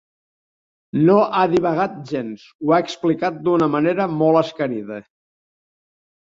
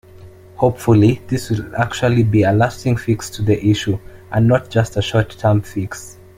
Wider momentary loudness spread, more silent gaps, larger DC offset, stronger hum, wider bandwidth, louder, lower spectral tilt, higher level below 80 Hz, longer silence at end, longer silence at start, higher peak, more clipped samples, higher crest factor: first, 12 LU vs 9 LU; first, 2.55-2.59 s vs none; neither; neither; second, 7.6 kHz vs 15.5 kHz; about the same, -19 LUFS vs -17 LUFS; about the same, -7.5 dB/octave vs -7 dB/octave; second, -62 dBFS vs -42 dBFS; first, 1.2 s vs 0.25 s; first, 0.95 s vs 0.2 s; about the same, -2 dBFS vs -2 dBFS; neither; about the same, 18 dB vs 16 dB